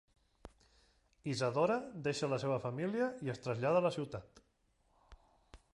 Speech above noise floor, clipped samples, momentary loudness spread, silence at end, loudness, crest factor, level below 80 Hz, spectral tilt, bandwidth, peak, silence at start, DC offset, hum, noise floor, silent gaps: 40 dB; under 0.1%; 10 LU; 0.2 s; -36 LUFS; 20 dB; -68 dBFS; -6 dB/octave; 11.5 kHz; -18 dBFS; 0.45 s; under 0.1%; none; -75 dBFS; none